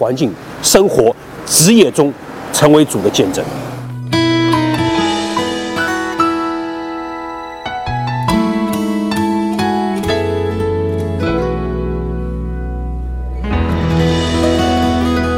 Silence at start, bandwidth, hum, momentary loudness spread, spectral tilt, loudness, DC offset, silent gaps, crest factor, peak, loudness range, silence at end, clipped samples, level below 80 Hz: 0 s; 17 kHz; none; 13 LU; -4.5 dB/octave; -15 LUFS; 0.2%; none; 14 dB; 0 dBFS; 7 LU; 0 s; under 0.1%; -28 dBFS